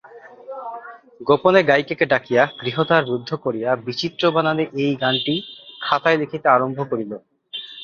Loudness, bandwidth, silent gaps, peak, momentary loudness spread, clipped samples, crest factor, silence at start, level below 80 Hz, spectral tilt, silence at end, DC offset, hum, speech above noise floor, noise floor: -19 LUFS; 7 kHz; none; 0 dBFS; 16 LU; under 0.1%; 20 dB; 0.05 s; -62 dBFS; -6 dB/octave; 0 s; under 0.1%; none; 20 dB; -39 dBFS